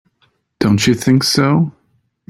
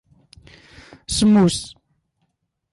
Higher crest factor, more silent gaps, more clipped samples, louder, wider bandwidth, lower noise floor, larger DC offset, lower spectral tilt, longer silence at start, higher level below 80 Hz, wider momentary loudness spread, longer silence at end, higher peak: about the same, 14 dB vs 14 dB; neither; neither; first, -14 LUFS vs -17 LUFS; first, 16 kHz vs 11.5 kHz; second, -61 dBFS vs -72 dBFS; neither; about the same, -5 dB/octave vs -5 dB/octave; second, 0.6 s vs 1.1 s; about the same, -48 dBFS vs -46 dBFS; second, 6 LU vs 23 LU; second, 0.6 s vs 1.05 s; first, -2 dBFS vs -8 dBFS